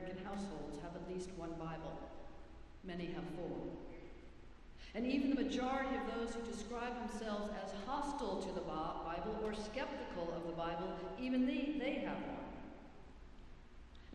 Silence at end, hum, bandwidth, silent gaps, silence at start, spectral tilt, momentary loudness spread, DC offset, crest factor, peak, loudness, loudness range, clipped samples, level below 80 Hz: 0 s; none; 11 kHz; none; 0 s; -5.5 dB/octave; 22 LU; under 0.1%; 18 dB; -24 dBFS; -43 LUFS; 7 LU; under 0.1%; -58 dBFS